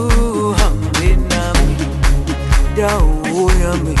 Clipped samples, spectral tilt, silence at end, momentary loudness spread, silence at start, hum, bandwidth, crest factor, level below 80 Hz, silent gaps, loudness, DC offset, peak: under 0.1%; -5.5 dB/octave; 0 s; 2 LU; 0 s; none; 12.5 kHz; 10 dB; -14 dBFS; none; -16 LUFS; under 0.1%; -2 dBFS